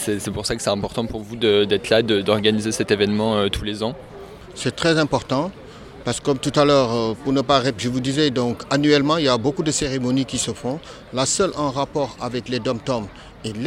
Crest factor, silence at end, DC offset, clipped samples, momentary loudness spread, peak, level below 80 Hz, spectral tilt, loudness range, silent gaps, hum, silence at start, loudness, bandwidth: 20 dB; 0 s; under 0.1%; under 0.1%; 12 LU; -2 dBFS; -46 dBFS; -4.5 dB/octave; 4 LU; none; none; 0 s; -21 LUFS; 16 kHz